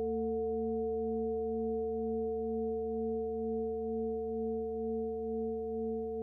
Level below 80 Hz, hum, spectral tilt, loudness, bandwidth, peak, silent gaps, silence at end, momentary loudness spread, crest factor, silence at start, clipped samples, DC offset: -54 dBFS; none; -12.5 dB/octave; -36 LUFS; 1.1 kHz; -26 dBFS; none; 0 s; 2 LU; 8 dB; 0 s; under 0.1%; under 0.1%